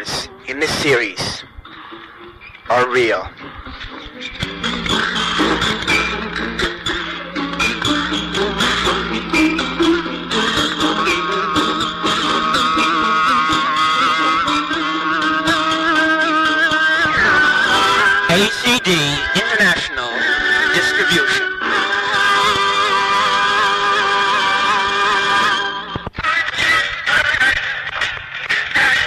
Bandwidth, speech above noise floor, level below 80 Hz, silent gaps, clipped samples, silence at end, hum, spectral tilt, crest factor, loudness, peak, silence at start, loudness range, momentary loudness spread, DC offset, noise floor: 14 kHz; 21 dB; -42 dBFS; none; under 0.1%; 0 s; none; -3 dB/octave; 12 dB; -15 LUFS; -4 dBFS; 0 s; 6 LU; 9 LU; under 0.1%; -38 dBFS